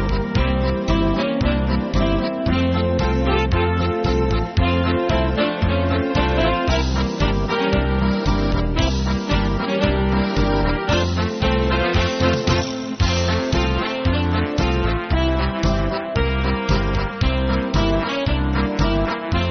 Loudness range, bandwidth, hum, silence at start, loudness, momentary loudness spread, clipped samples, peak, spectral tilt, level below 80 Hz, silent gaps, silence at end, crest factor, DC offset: 1 LU; 6.6 kHz; none; 0 s; -20 LUFS; 3 LU; under 0.1%; -4 dBFS; -5 dB/octave; -24 dBFS; none; 0 s; 14 dB; under 0.1%